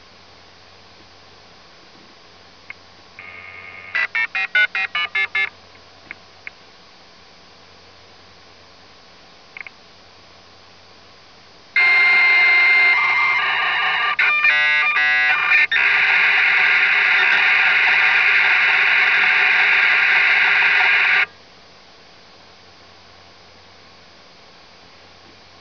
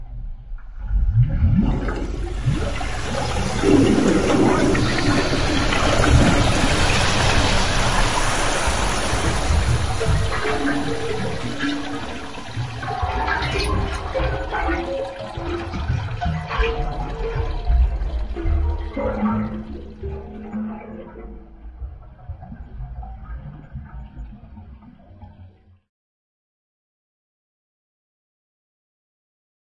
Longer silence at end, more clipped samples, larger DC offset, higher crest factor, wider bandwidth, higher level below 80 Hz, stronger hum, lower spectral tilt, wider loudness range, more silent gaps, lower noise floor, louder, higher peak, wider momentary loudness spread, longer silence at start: first, 4.35 s vs 3.8 s; neither; neither; about the same, 16 dB vs 20 dB; second, 5.4 kHz vs 11.5 kHz; second, -66 dBFS vs -26 dBFS; neither; second, -1 dB/octave vs -5 dB/octave; second, 12 LU vs 20 LU; neither; about the same, -46 dBFS vs -47 dBFS; first, -13 LUFS vs -21 LUFS; about the same, -2 dBFS vs -2 dBFS; second, 11 LU vs 20 LU; first, 3.2 s vs 0 s